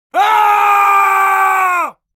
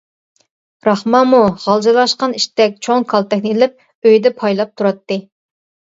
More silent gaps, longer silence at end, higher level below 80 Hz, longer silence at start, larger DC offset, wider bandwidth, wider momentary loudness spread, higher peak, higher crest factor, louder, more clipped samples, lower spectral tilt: second, none vs 3.95-4.02 s; second, 0.25 s vs 0.75 s; second, -72 dBFS vs -58 dBFS; second, 0.15 s vs 0.85 s; neither; first, 17 kHz vs 8 kHz; second, 4 LU vs 7 LU; about the same, 0 dBFS vs 0 dBFS; about the same, 12 dB vs 14 dB; first, -11 LUFS vs -14 LUFS; neither; second, 0 dB/octave vs -5 dB/octave